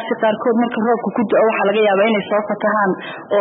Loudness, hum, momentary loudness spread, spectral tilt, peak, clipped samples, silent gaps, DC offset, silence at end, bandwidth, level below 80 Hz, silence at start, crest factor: -17 LUFS; none; 6 LU; -11 dB/octave; -4 dBFS; under 0.1%; none; under 0.1%; 0 s; 4 kHz; -70 dBFS; 0 s; 12 dB